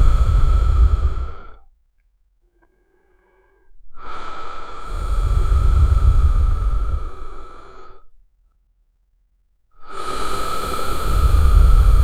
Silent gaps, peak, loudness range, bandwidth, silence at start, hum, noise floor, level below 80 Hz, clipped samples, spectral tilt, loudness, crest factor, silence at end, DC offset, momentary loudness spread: none; 0 dBFS; 18 LU; 14.5 kHz; 0 s; none; -61 dBFS; -18 dBFS; under 0.1%; -6 dB/octave; -20 LUFS; 16 dB; 0 s; under 0.1%; 21 LU